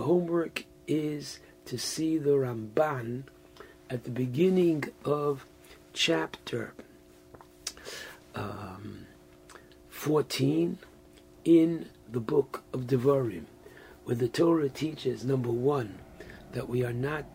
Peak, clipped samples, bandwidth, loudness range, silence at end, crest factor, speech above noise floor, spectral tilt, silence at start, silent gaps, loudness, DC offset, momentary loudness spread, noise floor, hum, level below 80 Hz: -12 dBFS; under 0.1%; 16 kHz; 6 LU; 0 s; 18 dB; 26 dB; -6 dB/octave; 0 s; none; -30 LUFS; under 0.1%; 17 LU; -55 dBFS; none; -62 dBFS